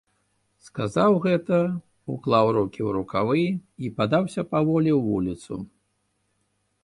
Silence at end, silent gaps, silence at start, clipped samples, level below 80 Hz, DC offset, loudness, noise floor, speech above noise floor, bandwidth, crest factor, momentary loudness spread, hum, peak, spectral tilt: 1.2 s; none; 0.65 s; under 0.1%; -56 dBFS; under 0.1%; -24 LUFS; -72 dBFS; 49 dB; 11.5 kHz; 18 dB; 14 LU; 50 Hz at -55 dBFS; -8 dBFS; -7.5 dB/octave